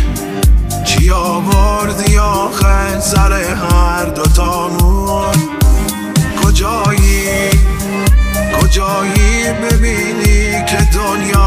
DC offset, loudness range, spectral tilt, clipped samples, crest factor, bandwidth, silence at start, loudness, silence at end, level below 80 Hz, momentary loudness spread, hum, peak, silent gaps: under 0.1%; 1 LU; -5 dB/octave; under 0.1%; 10 dB; 16 kHz; 0 s; -12 LUFS; 0 s; -14 dBFS; 3 LU; none; 0 dBFS; none